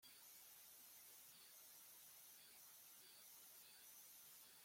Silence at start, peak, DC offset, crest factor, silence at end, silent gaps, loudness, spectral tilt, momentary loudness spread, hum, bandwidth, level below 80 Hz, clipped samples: 0 s; -50 dBFS; under 0.1%; 14 dB; 0 s; none; -62 LUFS; 1 dB/octave; 1 LU; none; 16.5 kHz; under -90 dBFS; under 0.1%